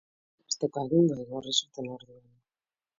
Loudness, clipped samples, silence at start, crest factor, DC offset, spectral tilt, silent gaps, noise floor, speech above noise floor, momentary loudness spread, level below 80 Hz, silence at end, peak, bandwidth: -29 LUFS; under 0.1%; 0.5 s; 20 dB; under 0.1%; -5 dB/octave; none; under -90 dBFS; over 61 dB; 15 LU; -70 dBFS; 0.85 s; -12 dBFS; 7.8 kHz